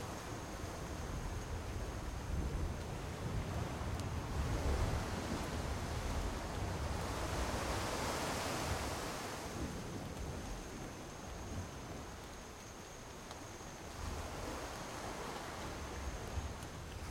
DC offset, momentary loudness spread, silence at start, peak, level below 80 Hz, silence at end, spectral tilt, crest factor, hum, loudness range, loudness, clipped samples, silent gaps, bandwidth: under 0.1%; 10 LU; 0 s; -24 dBFS; -48 dBFS; 0 s; -4.5 dB/octave; 18 dB; none; 8 LU; -43 LUFS; under 0.1%; none; 16.5 kHz